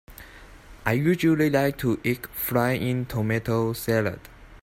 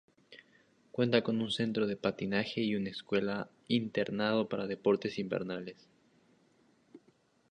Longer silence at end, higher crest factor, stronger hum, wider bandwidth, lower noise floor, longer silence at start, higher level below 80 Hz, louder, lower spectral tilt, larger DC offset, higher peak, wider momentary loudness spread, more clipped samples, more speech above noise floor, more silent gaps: second, 0.05 s vs 0.55 s; second, 18 dB vs 24 dB; neither; first, 16 kHz vs 10 kHz; second, -46 dBFS vs -69 dBFS; second, 0.1 s vs 0.3 s; first, -50 dBFS vs -72 dBFS; first, -24 LUFS vs -33 LUFS; about the same, -6.5 dB/octave vs -6.5 dB/octave; neither; about the same, -8 dBFS vs -10 dBFS; first, 10 LU vs 7 LU; neither; second, 22 dB vs 36 dB; neither